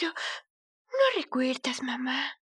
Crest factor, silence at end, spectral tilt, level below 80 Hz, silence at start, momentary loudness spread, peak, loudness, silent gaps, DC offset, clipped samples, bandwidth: 18 dB; 0.2 s; -2 dB/octave; under -90 dBFS; 0 s; 10 LU; -12 dBFS; -29 LUFS; 0.50-0.85 s; under 0.1%; under 0.1%; 11.5 kHz